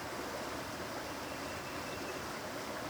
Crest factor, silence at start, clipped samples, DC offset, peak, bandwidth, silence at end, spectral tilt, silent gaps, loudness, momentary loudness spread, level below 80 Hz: 12 dB; 0 s; under 0.1%; under 0.1%; -28 dBFS; over 20 kHz; 0 s; -3.5 dB/octave; none; -41 LUFS; 1 LU; -64 dBFS